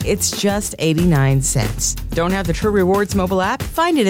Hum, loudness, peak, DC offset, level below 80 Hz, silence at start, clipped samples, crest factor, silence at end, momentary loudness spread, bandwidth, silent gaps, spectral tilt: none; -17 LUFS; -6 dBFS; under 0.1%; -30 dBFS; 0 s; under 0.1%; 12 dB; 0 s; 4 LU; 17 kHz; none; -4.5 dB/octave